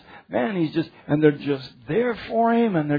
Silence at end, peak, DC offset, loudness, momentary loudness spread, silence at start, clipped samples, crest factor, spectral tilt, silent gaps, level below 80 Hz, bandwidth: 0 s; -4 dBFS; under 0.1%; -23 LUFS; 9 LU; 0.1 s; under 0.1%; 18 dB; -9.5 dB/octave; none; -58 dBFS; 5 kHz